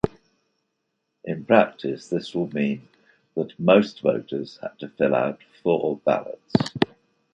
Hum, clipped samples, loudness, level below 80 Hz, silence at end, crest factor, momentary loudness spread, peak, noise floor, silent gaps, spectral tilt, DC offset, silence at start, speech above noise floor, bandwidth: none; under 0.1%; -24 LUFS; -56 dBFS; 0.5 s; 22 dB; 15 LU; -2 dBFS; -77 dBFS; none; -7 dB/octave; under 0.1%; 0.05 s; 54 dB; 9 kHz